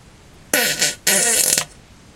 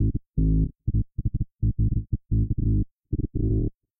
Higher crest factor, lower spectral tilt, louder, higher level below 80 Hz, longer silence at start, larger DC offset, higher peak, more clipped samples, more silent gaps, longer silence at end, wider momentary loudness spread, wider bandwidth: first, 20 dB vs 12 dB; second, 0 dB/octave vs -22.5 dB/octave; first, -16 LUFS vs -27 LUFS; second, -52 dBFS vs -28 dBFS; first, 0.55 s vs 0 s; neither; first, 0 dBFS vs -12 dBFS; neither; second, none vs 2.91-2.98 s; first, 0.5 s vs 0.3 s; about the same, 6 LU vs 6 LU; first, over 20 kHz vs 0.7 kHz